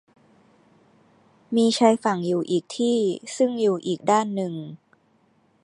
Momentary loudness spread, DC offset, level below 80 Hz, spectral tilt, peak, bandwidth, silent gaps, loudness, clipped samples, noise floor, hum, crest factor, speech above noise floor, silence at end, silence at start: 10 LU; under 0.1%; -76 dBFS; -5 dB/octave; -4 dBFS; 11 kHz; none; -23 LUFS; under 0.1%; -63 dBFS; none; 22 dB; 41 dB; 0.85 s; 1.5 s